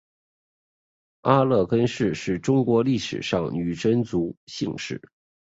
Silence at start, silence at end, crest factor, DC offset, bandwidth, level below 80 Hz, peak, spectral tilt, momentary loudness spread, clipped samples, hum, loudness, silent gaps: 1.25 s; 0.5 s; 22 dB; under 0.1%; 8 kHz; -54 dBFS; -4 dBFS; -6.5 dB/octave; 11 LU; under 0.1%; none; -24 LUFS; 4.37-4.47 s